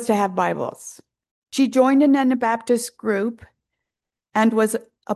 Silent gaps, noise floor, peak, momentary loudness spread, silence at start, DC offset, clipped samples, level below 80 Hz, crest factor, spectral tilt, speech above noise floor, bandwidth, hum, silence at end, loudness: 1.31-1.42 s; -87 dBFS; -6 dBFS; 13 LU; 0 s; under 0.1%; under 0.1%; -64 dBFS; 16 dB; -5 dB/octave; 67 dB; 12.5 kHz; none; 0 s; -20 LUFS